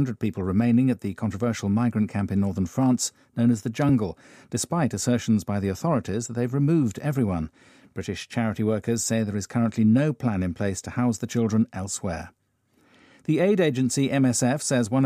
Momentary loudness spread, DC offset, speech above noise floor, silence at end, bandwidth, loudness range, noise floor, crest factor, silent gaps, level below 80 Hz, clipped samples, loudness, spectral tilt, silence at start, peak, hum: 9 LU; under 0.1%; 42 dB; 0 s; 15.5 kHz; 2 LU; -66 dBFS; 14 dB; none; -58 dBFS; under 0.1%; -24 LUFS; -6 dB/octave; 0 s; -10 dBFS; none